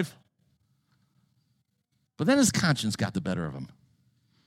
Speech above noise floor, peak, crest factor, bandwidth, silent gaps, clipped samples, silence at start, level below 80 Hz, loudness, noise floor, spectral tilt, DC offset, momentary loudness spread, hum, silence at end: 49 dB; -10 dBFS; 20 dB; 16.5 kHz; none; under 0.1%; 0 s; -60 dBFS; -27 LUFS; -76 dBFS; -4.5 dB/octave; under 0.1%; 16 LU; none; 0.8 s